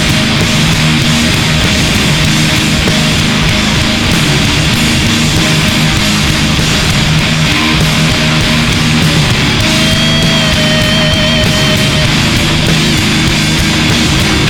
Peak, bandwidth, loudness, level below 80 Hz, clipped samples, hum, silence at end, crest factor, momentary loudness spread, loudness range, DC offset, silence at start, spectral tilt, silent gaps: 0 dBFS; 19.5 kHz; -9 LUFS; -22 dBFS; under 0.1%; none; 0 s; 10 dB; 1 LU; 1 LU; 0.3%; 0 s; -4 dB/octave; none